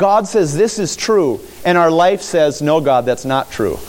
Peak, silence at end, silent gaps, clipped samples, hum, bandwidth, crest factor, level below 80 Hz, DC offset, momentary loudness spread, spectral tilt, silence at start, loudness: -2 dBFS; 0 s; none; under 0.1%; none; 17 kHz; 12 dB; -46 dBFS; under 0.1%; 7 LU; -5 dB/octave; 0 s; -15 LUFS